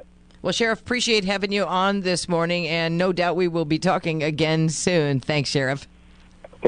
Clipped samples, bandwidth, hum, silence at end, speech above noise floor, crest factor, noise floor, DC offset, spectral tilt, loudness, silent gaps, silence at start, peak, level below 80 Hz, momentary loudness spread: under 0.1%; 10.5 kHz; none; 0 s; 27 dB; 18 dB; -49 dBFS; under 0.1%; -4.5 dB/octave; -22 LUFS; none; 0.45 s; -4 dBFS; -52 dBFS; 3 LU